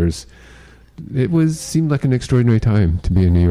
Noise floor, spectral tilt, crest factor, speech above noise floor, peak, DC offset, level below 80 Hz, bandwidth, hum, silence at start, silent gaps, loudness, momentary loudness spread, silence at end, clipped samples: -44 dBFS; -7.5 dB/octave; 12 dB; 28 dB; -4 dBFS; under 0.1%; -30 dBFS; 14 kHz; none; 0 s; none; -17 LUFS; 9 LU; 0 s; under 0.1%